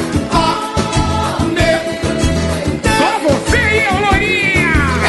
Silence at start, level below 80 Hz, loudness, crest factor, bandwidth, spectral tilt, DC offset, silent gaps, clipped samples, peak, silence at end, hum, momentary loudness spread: 0 s; -24 dBFS; -14 LUFS; 12 dB; 12 kHz; -5 dB/octave; under 0.1%; none; under 0.1%; -2 dBFS; 0 s; none; 5 LU